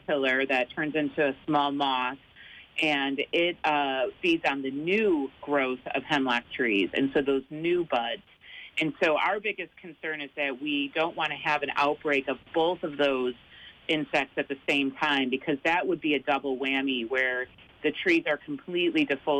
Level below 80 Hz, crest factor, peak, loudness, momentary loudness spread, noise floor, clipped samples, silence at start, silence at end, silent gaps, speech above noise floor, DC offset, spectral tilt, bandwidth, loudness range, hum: -66 dBFS; 14 dB; -14 dBFS; -27 LUFS; 8 LU; -49 dBFS; under 0.1%; 0.1 s; 0 s; none; 22 dB; under 0.1%; -5 dB/octave; 9.6 kHz; 2 LU; none